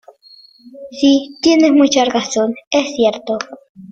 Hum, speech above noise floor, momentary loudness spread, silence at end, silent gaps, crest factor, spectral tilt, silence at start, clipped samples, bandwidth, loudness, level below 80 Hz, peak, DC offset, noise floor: none; 31 dB; 12 LU; 0 s; 2.67-2.71 s, 3.69-3.75 s; 14 dB; -3 dB/octave; 0.65 s; under 0.1%; 7.8 kHz; -14 LUFS; -58 dBFS; -2 dBFS; under 0.1%; -45 dBFS